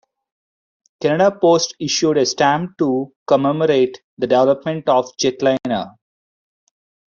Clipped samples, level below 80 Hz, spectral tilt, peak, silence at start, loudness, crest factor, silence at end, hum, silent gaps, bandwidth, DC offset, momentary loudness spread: under 0.1%; -62 dBFS; -4.5 dB/octave; -2 dBFS; 1 s; -17 LUFS; 16 dB; 1.2 s; none; 3.16-3.26 s, 4.04-4.17 s; 7.4 kHz; under 0.1%; 8 LU